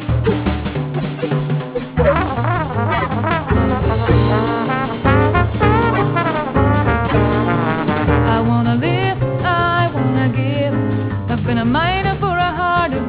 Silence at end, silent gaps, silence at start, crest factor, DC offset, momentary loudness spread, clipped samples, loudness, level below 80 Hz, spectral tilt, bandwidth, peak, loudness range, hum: 0 s; none; 0 s; 14 dB; under 0.1%; 5 LU; under 0.1%; -17 LUFS; -28 dBFS; -11 dB/octave; 4 kHz; -2 dBFS; 2 LU; none